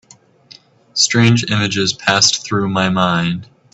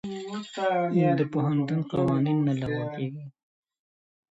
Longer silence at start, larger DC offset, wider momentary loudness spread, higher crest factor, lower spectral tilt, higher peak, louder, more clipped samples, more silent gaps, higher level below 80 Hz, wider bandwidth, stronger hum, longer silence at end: first, 0.95 s vs 0.05 s; neither; second, 8 LU vs 12 LU; about the same, 16 dB vs 14 dB; second, -3.5 dB/octave vs -8 dB/octave; first, 0 dBFS vs -12 dBFS; first, -14 LUFS vs -27 LUFS; neither; neither; first, -50 dBFS vs -60 dBFS; about the same, 8.4 kHz vs 8 kHz; neither; second, 0.3 s vs 1 s